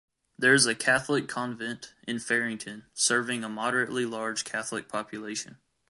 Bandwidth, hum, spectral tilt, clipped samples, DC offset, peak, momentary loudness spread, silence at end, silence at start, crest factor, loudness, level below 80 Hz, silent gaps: 11.5 kHz; none; -2.5 dB/octave; under 0.1%; under 0.1%; -8 dBFS; 14 LU; 0.35 s; 0.4 s; 22 dB; -27 LUFS; -70 dBFS; none